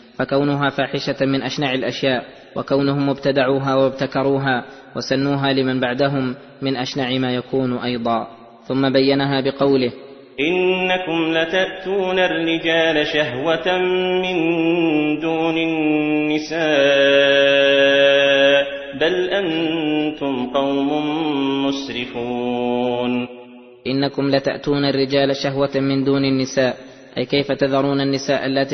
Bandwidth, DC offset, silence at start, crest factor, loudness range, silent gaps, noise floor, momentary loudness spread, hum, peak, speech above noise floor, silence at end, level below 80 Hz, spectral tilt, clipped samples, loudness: 6.4 kHz; under 0.1%; 0.2 s; 16 dB; 6 LU; none; -41 dBFS; 10 LU; none; -2 dBFS; 22 dB; 0 s; -54 dBFS; -5.5 dB/octave; under 0.1%; -18 LUFS